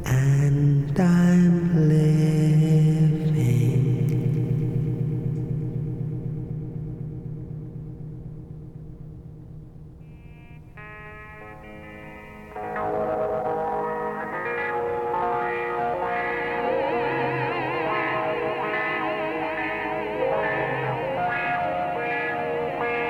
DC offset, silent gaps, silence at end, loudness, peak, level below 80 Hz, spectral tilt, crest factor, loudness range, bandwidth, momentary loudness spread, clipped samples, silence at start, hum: under 0.1%; none; 0 s; -24 LUFS; -10 dBFS; -46 dBFS; -8 dB/octave; 14 dB; 21 LU; 13 kHz; 22 LU; under 0.1%; 0 s; none